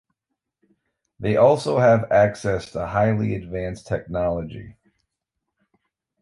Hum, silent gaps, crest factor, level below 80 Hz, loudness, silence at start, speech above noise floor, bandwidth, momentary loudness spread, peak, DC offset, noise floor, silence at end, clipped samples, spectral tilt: none; none; 18 dB; -46 dBFS; -21 LUFS; 1.2 s; 61 dB; 11.5 kHz; 13 LU; -4 dBFS; under 0.1%; -81 dBFS; 1.5 s; under 0.1%; -7 dB/octave